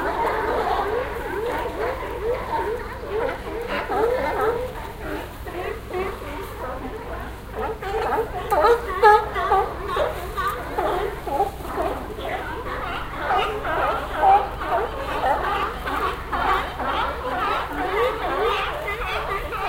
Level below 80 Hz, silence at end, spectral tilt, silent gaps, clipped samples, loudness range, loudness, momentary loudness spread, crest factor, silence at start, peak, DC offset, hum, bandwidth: -36 dBFS; 0 s; -5 dB/octave; none; under 0.1%; 6 LU; -24 LUFS; 12 LU; 20 dB; 0 s; -4 dBFS; under 0.1%; none; 17 kHz